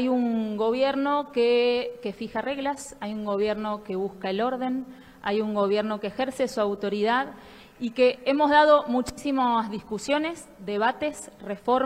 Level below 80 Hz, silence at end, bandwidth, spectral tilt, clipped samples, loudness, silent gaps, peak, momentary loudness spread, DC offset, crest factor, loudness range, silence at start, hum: -60 dBFS; 0 s; 15.5 kHz; -5 dB/octave; under 0.1%; -26 LUFS; none; -6 dBFS; 12 LU; under 0.1%; 18 dB; 6 LU; 0 s; none